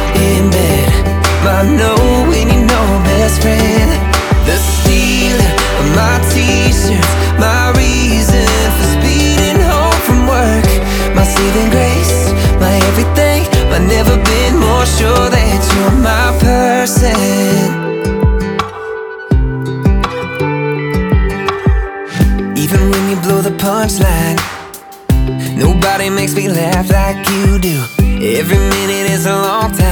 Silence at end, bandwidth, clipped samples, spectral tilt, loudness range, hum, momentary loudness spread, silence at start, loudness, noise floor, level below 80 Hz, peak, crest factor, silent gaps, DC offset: 0 s; over 20 kHz; under 0.1%; -5 dB/octave; 4 LU; none; 5 LU; 0 s; -11 LUFS; -30 dBFS; -16 dBFS; 0 dBFS; 10 dB; none; under 0.1%